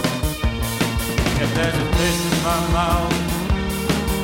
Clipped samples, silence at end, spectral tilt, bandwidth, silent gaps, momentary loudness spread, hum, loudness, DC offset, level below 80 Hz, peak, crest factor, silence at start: under 0.1%; 0 s; -4.5 dB/octave; 16.5 kHz; none; 3 LU; none; -20 LUFS; under 0.1%; -26 dBFS; -6 dBFS; 14 dB; 0 s